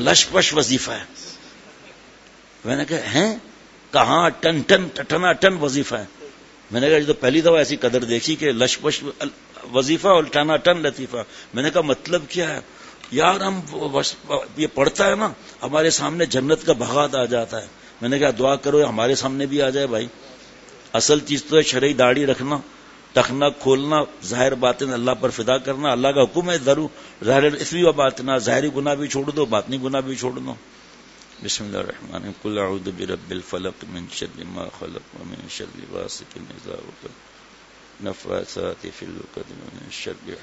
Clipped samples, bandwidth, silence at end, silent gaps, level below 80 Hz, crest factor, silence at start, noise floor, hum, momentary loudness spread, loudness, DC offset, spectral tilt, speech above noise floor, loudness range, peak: under 0.1%; 8 kHz; 0 s; none; -54 dBFS; 22 dB; 0 s; -48 dBFS; none; 17 LU; -20 LUFS; under 0.1%; -3.5 dB/octave; 27 dB; 13 LU; 0 dBFS